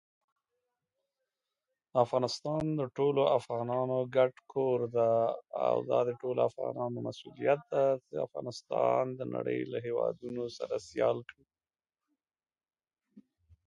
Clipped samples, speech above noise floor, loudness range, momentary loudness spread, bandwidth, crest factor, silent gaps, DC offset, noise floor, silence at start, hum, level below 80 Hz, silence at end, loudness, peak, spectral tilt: under 0.1%; over 59 dB; 6 LU; 9 LU; 11 kHz; 20 dB; none; under 0.1%; under -90 dBFS; 1.95 s; none; -74 dBFS; 0.45 s; -32 LUFS; -12 dBFS; -6.5 dB/octave